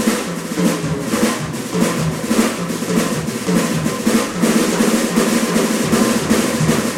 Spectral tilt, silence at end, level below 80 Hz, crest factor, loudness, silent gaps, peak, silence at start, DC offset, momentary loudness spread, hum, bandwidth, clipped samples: -4.5 dB/octave; 0 s; -44 dBFS; 14 dB; -17 LUFS; none; -2 dBFS; 0 s; under 0.1%; 5 LU; none; 16 kHz; under 0.1%